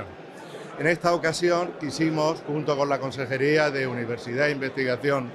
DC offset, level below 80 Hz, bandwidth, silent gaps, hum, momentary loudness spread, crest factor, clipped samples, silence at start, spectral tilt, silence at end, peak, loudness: under 0.1%; -66 dBFS; 13 kHz; none; none; 9 LU; 18 dB; under 0.1%; 0 s; -5.5 dB/octave; 0 s; -8 dBFS; -25 LUFS